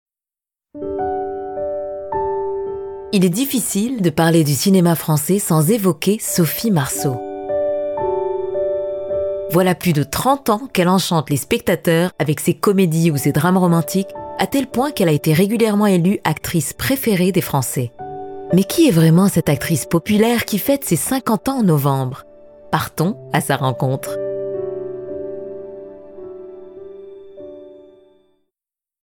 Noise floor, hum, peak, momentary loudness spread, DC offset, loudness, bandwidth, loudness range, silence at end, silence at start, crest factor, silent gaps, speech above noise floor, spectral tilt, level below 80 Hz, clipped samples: -90 dBFS; none; -2 dBFS; 15 LU; under 0.1%; -18 LUFS; over 20 kHz; 8 LU; 1.25 s; 0.75 s; 14 dB; none; 74 dB; -5.5 dB/octave; -50 dBFS; under 0.1%